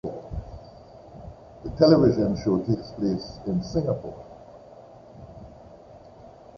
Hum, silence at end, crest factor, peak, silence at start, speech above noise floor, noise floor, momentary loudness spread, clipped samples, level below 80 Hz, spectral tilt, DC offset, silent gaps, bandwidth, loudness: none; 0.3 s; 24 dB; -4 dBFS; 0.05 s; 25 dB; -48 dBFS; 28 LU; under 0.1%; -46 dBFS; -8 dB/octave; under 0.1%; none; 7 kHz; -24 LUFS